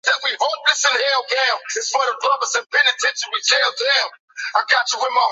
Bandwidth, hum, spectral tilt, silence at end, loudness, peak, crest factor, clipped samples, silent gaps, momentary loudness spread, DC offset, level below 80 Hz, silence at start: 8 kHz; none; 4.5 dB/octave; 0 s; -17 LUFS; -2 dBFS; 18 dB; under 0.1%; 4.20-4.28 s; 6 LU; under 0.1%; -84 dBFS; 0.05 s